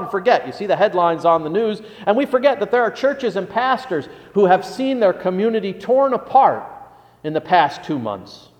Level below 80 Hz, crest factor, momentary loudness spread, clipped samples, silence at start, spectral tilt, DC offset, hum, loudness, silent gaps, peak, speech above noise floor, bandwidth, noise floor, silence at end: -62 dBFS; 16 dB; 10 LU; under 0.1%; 0 s; -6 dB/octave; under 0.1%; none; -18 LUFS; none; -2 dBFS; 24 dB; 10 kHz; -42 dBFS; 0.25 s